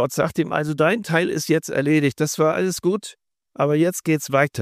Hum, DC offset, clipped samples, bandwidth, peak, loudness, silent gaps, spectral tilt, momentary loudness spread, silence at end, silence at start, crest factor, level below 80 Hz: none; under 0.1%; under 0.1%; 15.5 kHz; -4 dBFS; -21 LUFS; none; -5.5 dB/octave; 4 LU; 0 s; 0 s; 16 dB; -60 dBFS